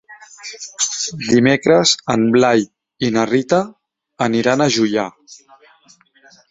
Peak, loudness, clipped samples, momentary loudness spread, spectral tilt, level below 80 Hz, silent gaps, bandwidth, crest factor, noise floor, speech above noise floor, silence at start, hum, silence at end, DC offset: 0 dBFS; -16 LUFS; under 0.1%; 17 LU; -4 dB/octave; -56 dBFS; none; 8 kHz; 16 dB; -52 dBFS; 36 dB; 0.1 s; none; 1.15 s; under 0.1%